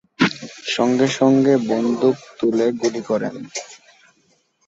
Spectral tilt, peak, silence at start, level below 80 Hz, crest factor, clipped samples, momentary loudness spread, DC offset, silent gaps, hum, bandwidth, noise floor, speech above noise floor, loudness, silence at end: -5 dB/octave; -2 dBFS; 0.2 s; -64 dBFS; 18 dB; under 0.1%; 15 LU; under 0.1%; none; none; 8 kHz; -62 dBFS; 44 dB; -19 LUFS; 0.9 s